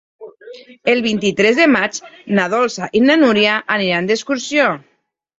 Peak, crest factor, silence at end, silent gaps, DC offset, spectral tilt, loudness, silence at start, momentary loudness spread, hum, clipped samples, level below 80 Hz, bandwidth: 0 dBFS; 16 dB; 0.6 s; none; under 0.1%; -4 dB/octave; -15 LUFS; 0.2 s; 9 LU; none; under 0.1%; -58 dBFS; 8 kHz